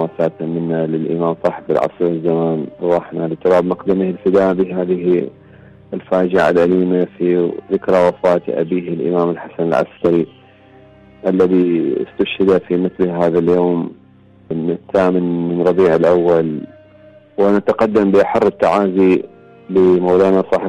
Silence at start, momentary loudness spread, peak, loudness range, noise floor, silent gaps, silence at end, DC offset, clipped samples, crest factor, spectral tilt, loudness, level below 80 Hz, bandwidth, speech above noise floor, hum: 0 s; 8 LU; -4 dBFS; 3 LU; -46 dBFS; none; 0 s; under 0.1%; under 0.1%; 12 dB; -8.5 dB/octave; -15 LUFS; -52 dBFS; 9 kHz; 31 dB; none